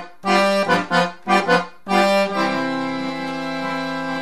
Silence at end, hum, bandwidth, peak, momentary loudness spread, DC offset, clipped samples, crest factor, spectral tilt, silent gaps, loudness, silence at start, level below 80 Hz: 0 s; none; 13.5 kHz; -2 dBFS; 8 LU; 0.8%; under 0.1%; 18 dB; -5 dB/octave; none; -19 LUFS; 0 s; -60 dBFS